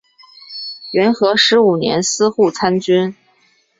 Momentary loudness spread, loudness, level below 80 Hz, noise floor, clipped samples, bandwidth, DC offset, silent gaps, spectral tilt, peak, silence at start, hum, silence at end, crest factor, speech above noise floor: 16 LU; -14 LUFS; -58 dBFS; -57 dBFS; under 0.1%; 7.8 kHz; under 0.1%; none; -3.5 dB/octave; 0 dBFS; 0.5 s; none; 0.65 s; 16 dB; 43 dB